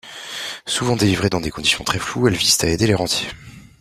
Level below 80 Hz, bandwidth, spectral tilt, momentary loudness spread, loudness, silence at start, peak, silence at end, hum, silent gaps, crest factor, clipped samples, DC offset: -44 dBFS; 16 kHz; -3.5 dB/octave; 13 LU; -18 LUFS; 0.05 s; -2 dBFS; 0.2 s; none; none; 18 dB; under 0.1%; under 0.1%